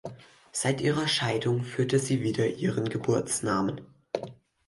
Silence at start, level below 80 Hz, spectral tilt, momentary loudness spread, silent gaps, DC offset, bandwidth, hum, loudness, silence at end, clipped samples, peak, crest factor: 0.05 s; -62 dBFS; -4.5 dB/octave; 10 LU; none; under 0.1%; 11.5 kHz; none; -28 LUFS; 0.35 s; under 0.1%; -12 dBFS; 16 dB